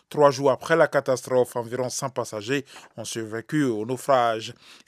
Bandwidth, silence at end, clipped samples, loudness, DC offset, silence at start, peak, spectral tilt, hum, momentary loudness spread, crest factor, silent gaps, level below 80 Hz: 15.5 kHz; 0.15 s; under 0.1%; -24 LUFS; under 0.1%; 0.1 s; -4 dBFS; -4.5 dB/octave; none; 12 LU; 20 dB; none; -74 dBFS